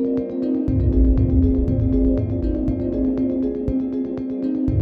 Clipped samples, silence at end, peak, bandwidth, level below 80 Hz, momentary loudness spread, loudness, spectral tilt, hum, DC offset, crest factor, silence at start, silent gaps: under 0.1%; 0 s; -6 dBFS; 4.5 kHz; -24 dBFS; 6 LU; -21 LUFS; -12.5 dB/octave; none; under 0.1%; 12 dB; 0 s; none